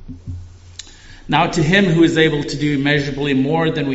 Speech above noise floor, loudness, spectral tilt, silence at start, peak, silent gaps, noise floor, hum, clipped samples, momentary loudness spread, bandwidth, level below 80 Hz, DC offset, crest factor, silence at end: 22 dB; -16 LUFS; -4.5 dB/octave; 0 s; 0 dBFS; none; -38 dBFS; none; under 0.1%; 22 LU; 8 kHz; -40 dBFS; under 0.1%; 16 dB; 0 s